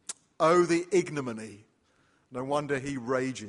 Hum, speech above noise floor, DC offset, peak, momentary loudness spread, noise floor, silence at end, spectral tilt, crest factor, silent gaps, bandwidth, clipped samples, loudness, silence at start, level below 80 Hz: none; 40 dB; under 0.1%; -12 dBFS; 18 LU; -68 dBFS; 0 s; -5 dB/octave; 18 dB; none; 11.5 kHz; under 0.1%; -28 LUFS; 0.1 s; -66 dBFS